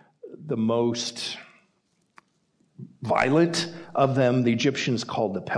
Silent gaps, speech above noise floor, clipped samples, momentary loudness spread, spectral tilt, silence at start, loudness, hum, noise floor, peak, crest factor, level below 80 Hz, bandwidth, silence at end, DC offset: none; 46 dB; under 0.1%; 13 LU; -5.5 dB/octave; 0.25 s; -24 LUFS; none; -70 dBFS; -8 dBFS; 18 dB; -64 dBFS; 10.5 kHz; 0 s; under 0.1%